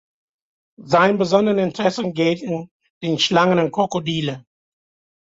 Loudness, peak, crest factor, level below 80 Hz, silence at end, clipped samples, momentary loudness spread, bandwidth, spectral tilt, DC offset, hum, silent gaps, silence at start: -19 LUFS; -4 dBFS; 18 dB; -60 dBFS; 0.9 s; under 0.1%; 12 LU; 7.8 kHz; -5.5 dB/octave; under 0.1%; none; 2.71-2.80 s, 2.90-3.01 s; 0.8 s